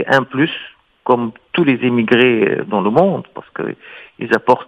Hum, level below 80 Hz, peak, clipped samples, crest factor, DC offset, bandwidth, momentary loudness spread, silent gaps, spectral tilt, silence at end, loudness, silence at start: none; -60 dBFS; 0 dBFS; under 0.1%; 16 dB; under 0.1%; 8.8 kHz; 17 LU; none; -7 dB/octave; 0.05 s; -16 LUFS; 0 s